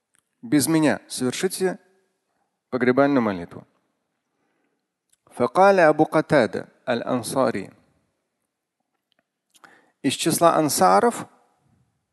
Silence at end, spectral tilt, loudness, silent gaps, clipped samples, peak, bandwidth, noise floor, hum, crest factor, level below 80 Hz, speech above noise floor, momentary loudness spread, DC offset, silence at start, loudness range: 0.85 s; -4.5 dB/octave; -21 LUFS; none; under 0.1%; -2 dBFS; 12.5 kHz; -79 dBFS; none; 22 dB; -64 dBFS; 59 dB; 15 LU; under 0.1%; 0.45 s; 8 LU